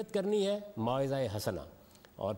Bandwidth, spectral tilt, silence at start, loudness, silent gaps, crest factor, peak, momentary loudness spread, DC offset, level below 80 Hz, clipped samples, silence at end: 16 kHz; -6 dB/octave; 0 s; -34 LUFS; none; 14 dB; -20 dBFS; 10 LU; under 0.1%; -64 dBFS; under 0.1%; 0 s